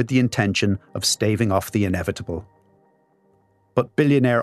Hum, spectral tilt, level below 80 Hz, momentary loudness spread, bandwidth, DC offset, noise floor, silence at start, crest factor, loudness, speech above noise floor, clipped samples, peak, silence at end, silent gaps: none; -5 dB/octave; -50 dBFS; 9 LU; 13.5 kHz; under 0.1%; -61 dBFS; 0 s; 18 dB; -21 LUFS; 41 dB; under 0.1%; -4 dBFS; 0 s; none